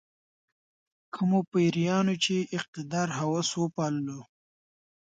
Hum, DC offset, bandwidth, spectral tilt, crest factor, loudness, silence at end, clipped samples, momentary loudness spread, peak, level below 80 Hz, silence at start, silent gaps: none; under 0.1%; 9.2 kHz; -5 dB/octave; 16 dB; -28 LUFS; 0.9 s; under 0.1%; 9 LU; -14 dBFS; -72 dBFS; 1.15 s; 1.48-1.52 s, 2.68-2.73 s